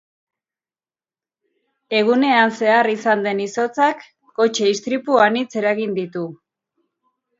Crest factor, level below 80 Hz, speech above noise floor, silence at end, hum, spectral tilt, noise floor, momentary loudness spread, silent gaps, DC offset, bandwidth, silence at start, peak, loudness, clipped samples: 20 dB; -72 dBFS; over 72 dB; 1.05 s; none; -4 dB/octave; under -90 dBFS; 11 LU; none; under 0.1%; 7.8 kHz; 1.9 s; 0 dBFS; -18 LUFS; under 0.1%